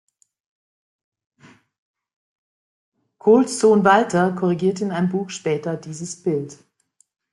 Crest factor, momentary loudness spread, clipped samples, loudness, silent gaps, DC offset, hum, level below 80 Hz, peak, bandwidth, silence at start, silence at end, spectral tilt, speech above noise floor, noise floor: 20 dB; 13 LU; under 0.1%; -19 LUFS; none; under 0.1%; none; -66 dBFS; -2 dBFS; 11.5 kHz; 3.25 s; 0.8 s; -6 dB/octave; 45 dB; -64 dBFS